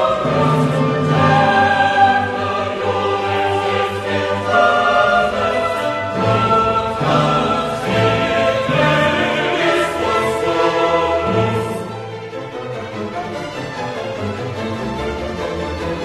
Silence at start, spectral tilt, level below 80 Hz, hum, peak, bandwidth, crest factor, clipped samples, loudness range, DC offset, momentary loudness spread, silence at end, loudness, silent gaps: 0 s; -5.5 dB/octave; -40 dBFS; none; 0 dBFS; 13 kHz; 16 dB; under 0.1%; 9 LU; under 0.1%; 12 LU; 0 s; -17 LUFS; none